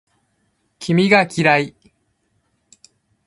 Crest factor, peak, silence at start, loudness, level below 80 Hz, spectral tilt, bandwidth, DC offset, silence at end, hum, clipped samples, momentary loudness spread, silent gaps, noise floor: 20 dB; 0 dBFS; 0.8 s; -16 LUFS; -60 dBFS; -5.5 dB/octave; 11.5 kHz; under 0.1%; 1.6 s; none; under 0.1%; 15 LU; none; -67 dBFS